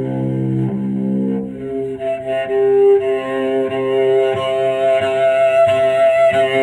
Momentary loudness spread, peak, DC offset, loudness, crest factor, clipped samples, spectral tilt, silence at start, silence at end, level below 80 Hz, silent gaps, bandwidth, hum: 9 LU; -4 dBFS; under 0.1%; -16 LUFS; 10 dB; under 0.1%; -7 dB/octave; 0 s; 0 s; -54 dBFS; none; 11 kHz; none